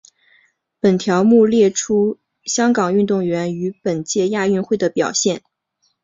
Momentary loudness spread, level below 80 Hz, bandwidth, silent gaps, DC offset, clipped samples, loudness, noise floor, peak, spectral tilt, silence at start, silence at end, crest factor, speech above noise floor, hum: 10 LU; -60 dBFS; 7.8 kHz; none; under 0.1%; under 0.1%; -17 LUFS; -67 dBFS; -2 dBFS; -5 dB/octave; 0.85 s; 0.65 s; 16 dB; 51 dB; none